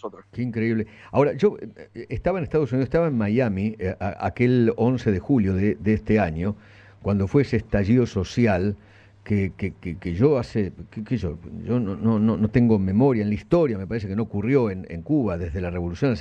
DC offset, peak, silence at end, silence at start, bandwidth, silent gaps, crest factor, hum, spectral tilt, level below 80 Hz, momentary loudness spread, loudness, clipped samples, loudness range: under 0.1%; -6 dBFS; 0 s; 0.05 s; 8 kHz; none; 16 dB; none; -9 dB/octave; -44 dBFS; 11 LU; -23 LUFS; under 0.1%; 3 LU